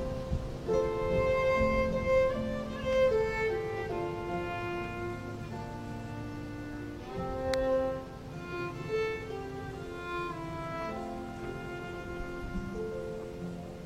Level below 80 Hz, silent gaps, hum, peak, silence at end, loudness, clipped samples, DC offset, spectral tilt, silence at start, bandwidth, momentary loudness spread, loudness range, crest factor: -46 dBFS; none; none; -10 dBFS; 0 s; -34 LUFS; under 0.1%; under 0.1%; -6.5 dB/octave; 0 s; 14.5 kHz; 13 LU; 9 LU; 22 dB